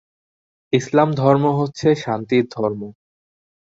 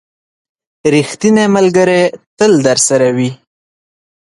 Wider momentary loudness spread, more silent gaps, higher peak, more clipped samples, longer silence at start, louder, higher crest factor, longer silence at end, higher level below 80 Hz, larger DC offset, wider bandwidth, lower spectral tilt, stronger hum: about the same, 8 LU vs 7 LU; second, none vs 2.26-2.37 s; about the same, -2 dBFS vs 0 dBFS; neither; second, 0.7 s vs 0.85 s; second, -19 LUFS vs -11 LUFS; first, 18 dB vs 12 dB; about the same, 0.9 s vs 1 s; about the same, -58 dBFS vs -54 dBFS; neither; second, 8 kHz vs 11.5 kHz; first, -7 dB/octave vs -4.5 dB/octave; neither